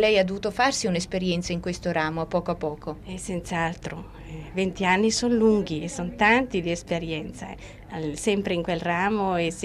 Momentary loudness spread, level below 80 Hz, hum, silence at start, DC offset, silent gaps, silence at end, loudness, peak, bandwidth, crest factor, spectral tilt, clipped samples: 15 LU; -46 dBFS; none; 0 s; under 0.1%; none; 0 s; -25 LUFS; -8 dBFS; 13.5 kHz; 18 dB; -4.5 dB/octave; under 0.1%